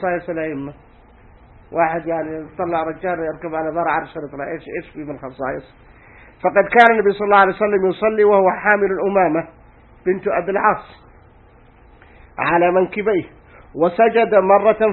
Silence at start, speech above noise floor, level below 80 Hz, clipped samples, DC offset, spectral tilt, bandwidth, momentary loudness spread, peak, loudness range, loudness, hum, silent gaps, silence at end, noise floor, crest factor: 0 s; 31 dB; -50 dBFS; under 0.1%; under 0.1%; -8 dB/octave; 5 kHz; 16 LU; 0 dBFS; 9 LU; -17 LUFS; none; none; 0 s; -48 dBFS; 18 dB